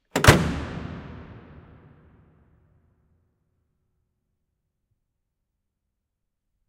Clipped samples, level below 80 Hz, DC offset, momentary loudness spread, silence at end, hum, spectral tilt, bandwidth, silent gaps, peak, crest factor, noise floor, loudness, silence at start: under 0.1%; -42 dBFS; under 0.1%; 26 LU; 5.3 s; none; -4.5 dB/octave; 16 kHz; none; 0 dBFS; 30 dB; -81 dBFS; -21 LUFS; 0.15 s